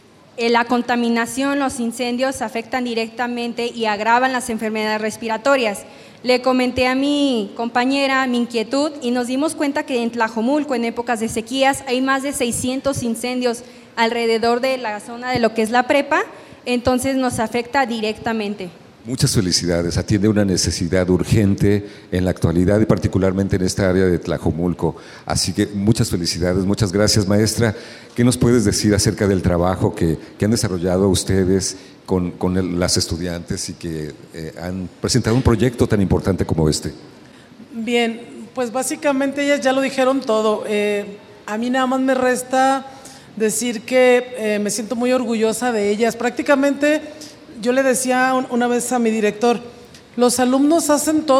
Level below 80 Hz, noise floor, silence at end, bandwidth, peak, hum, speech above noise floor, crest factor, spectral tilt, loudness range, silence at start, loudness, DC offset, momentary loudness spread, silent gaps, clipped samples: -40 dBFS; -43 dBFS; 0 s; 16 kHz; 0 dBFS; none; 25 dB; 18 dB; -5 dB/octave; 3 LU; 0.35 s; -18 LUFS; under 0.1%; 9 LU; none; under 0.1%